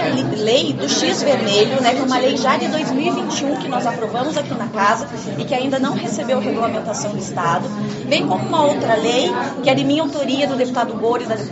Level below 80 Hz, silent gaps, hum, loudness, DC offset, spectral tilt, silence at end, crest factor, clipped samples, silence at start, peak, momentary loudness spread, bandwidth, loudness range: -58 dBFS; none; none; -18 LUFS; under 0.1%; -4.5 dB/octave; 0 s; 16 dB; under 0.1%; 0 s; -2 dBFS; 6 LU; 8.2 kHz; 3 LU